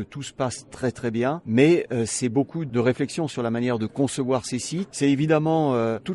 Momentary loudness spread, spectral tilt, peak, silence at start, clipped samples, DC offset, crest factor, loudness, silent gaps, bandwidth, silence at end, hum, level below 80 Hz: 9 LU; -5.5 dB/octave; -6 dBFS; 0 s; under 0.1%; under 0.1%; 18 dB; -24 LUFS; none; 11.5 kHz; 0 s; none; -60 dBFS